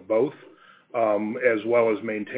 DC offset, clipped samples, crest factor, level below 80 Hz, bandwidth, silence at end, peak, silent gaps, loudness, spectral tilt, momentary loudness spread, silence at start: under 0.1%; under 0.1%; 16 dB; -74 dBFS; 4 kHz; 0 s; -8 dBFS; none; -24 LUFS; -10 dB/octave; 7 LU; 0 s